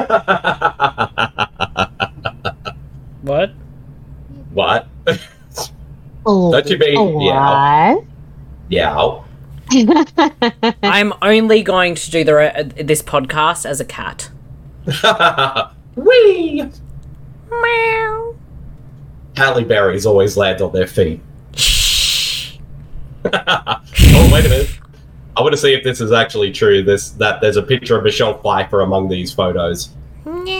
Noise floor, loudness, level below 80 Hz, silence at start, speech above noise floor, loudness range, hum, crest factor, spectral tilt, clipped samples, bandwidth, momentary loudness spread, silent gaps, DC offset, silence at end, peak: -37 dBFS; -14 LUFS; -26 dBFS; 0 s; 24 dB; 7 LU; none; 14 dB; -4.5 dB/octave; under 0.1%; 17.5 kHz; 14 LU; none; under 0.1%; 0 s; 0 dBFS